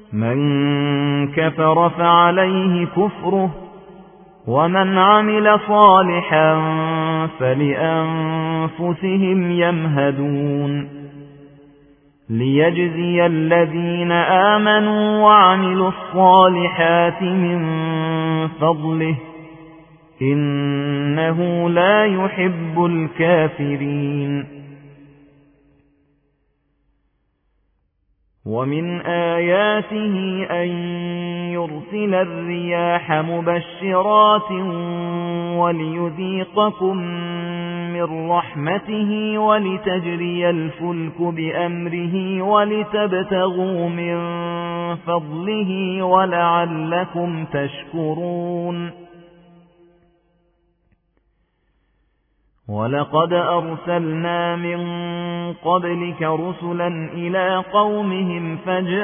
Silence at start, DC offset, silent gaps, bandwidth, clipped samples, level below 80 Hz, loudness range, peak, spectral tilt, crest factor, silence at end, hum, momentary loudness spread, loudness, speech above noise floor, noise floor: 0.1 s; under 0.1%; none; 3.6 kHz; under 0.1%; -58 dBFS; 9 LU; 0 dBFS; -10.5 dB/octave; 18 dB; 0 s; none; 11 LU; -18 LUFS; 48 dB; -66 dBFS